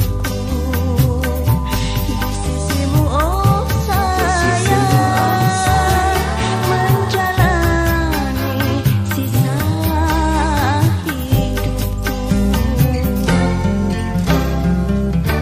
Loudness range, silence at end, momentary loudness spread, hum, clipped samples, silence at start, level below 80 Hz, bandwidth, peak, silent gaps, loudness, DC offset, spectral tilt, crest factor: 2 LU; 0 s; 5 LU; none; under 0.1%; 0 s; -22 dBFS; 15.5 kHz; 0 dBFS; none; -16 LUFS; under 0.1%; -6 dB/octave; 14 dB